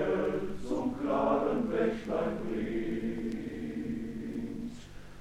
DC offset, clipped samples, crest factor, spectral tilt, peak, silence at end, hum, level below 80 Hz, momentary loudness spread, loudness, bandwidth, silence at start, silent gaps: under 0.1%; under 0.1%; 18 dB; -7.5 dB/octave; -14 dBFS; 0 s; none; -52 dBFS; 9 LU; -33 LUFS; 13 kHz; 0 s; none